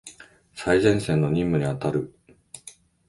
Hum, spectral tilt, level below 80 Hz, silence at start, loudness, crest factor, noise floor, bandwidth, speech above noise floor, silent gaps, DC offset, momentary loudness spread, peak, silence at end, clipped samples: none; -6.5 dB/octave; -48 dBFS; 0.05 s; -23 LUFS; 20 dB; -50 dBFS; 11.5 kHz; 27 dB; none; under 0.1%; 23 LU; -4 dBFS; 0.4 s; under 0.1%